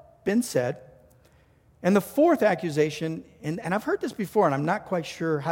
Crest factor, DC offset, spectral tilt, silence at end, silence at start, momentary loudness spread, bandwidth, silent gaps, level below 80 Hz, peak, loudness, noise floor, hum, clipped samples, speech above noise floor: 18 dB; under 0.1%; -6 dB/octave; 0 s; 0.25 s; 11 LU; 17 kHz; none; -64 dBFS; -8 dBFS; -26 LUFS; -59 dBFS; none; under 0.1%; 34 dB